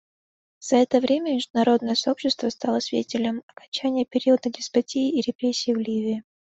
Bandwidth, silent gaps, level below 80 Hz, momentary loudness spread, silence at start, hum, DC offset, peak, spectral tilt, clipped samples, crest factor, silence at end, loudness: 8.2 kHz; 1.50-1.54 s, 3.43-3.48 s, 3.68-3.72 s, 5.35-5.39 s; -66 dBFS; 7 LU; 0.6 s; none; under 0.1%; -6 dBFS; -4 dB/octave; under 0.1%; 18 dB; 0.3 s; -24 LUFS